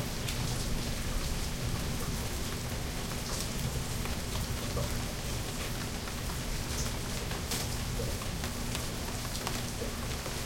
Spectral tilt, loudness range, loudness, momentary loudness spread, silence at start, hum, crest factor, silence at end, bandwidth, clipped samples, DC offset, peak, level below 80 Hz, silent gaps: -4 dB/octave; 0 LU; -35 LUFS; 2 LU; 0 s; none; 24 dB; 0 s; 16.5 kHz; under 0.1%; under 0.1%; -10 dBFS; -40 dBFS; none